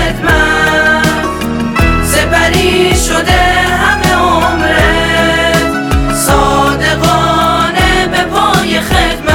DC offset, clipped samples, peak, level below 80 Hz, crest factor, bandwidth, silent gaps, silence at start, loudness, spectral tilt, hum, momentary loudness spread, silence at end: under 0.1%; under 0.1%; 0 dBFS; -20 dBFS; 10 dB; 19 kHz; none; 0 s; -9 LUFS; -4 dB/octave; none; 3 LU; 0 s